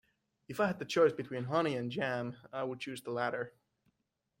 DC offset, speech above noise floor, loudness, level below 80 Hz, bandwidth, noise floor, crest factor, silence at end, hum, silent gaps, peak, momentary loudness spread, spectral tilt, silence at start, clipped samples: under 0.1%; 49 dB; -35 LUFS; -76 dBFS; 16.5 kHz; -84 dBFS; 20 dB; 0.9 s; none; none; -16 dBFS; 12 LU; -5.5 dB/octave; 0.5 s; under 0.1%